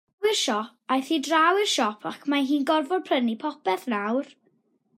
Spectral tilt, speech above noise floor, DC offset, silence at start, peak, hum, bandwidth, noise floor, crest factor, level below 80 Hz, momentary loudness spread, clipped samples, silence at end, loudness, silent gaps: -2.5 dB/octave; 43 dB; under 0.1%; 0.2 s; -8 dBFS; none; 16 kHz; -67 dBFS; 16 dB; -84 dBFS; 9 LU; under 0.1%; 0.75 s; -25 LUFS; none